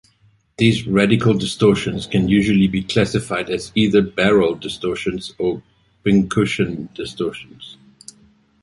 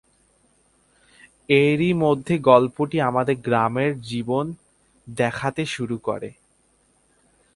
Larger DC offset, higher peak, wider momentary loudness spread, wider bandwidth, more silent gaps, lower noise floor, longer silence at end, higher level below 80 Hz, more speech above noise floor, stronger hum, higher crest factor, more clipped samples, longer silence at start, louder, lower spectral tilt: neither; about the same, -2 dBFS vs 0 dBFS; about the same, 11 LU vs 13 LU; about the same, 11.5 kHz vs 11.5 kHz; neither; second, -57 dBFS vs -63 dBFS; second, 0.9 s vs 1.25 s; first, -44 dBFS vs -58 dBFS; about the same, 39 dB vs 42 dB; neither; about the same, 18 dB vs 22 dB; neither; second, 0.6 s vs 1.5 s; first, -18 LUFS vs -21 LUFS; about the same, -6 dB/octave vs -6.5 dB/octave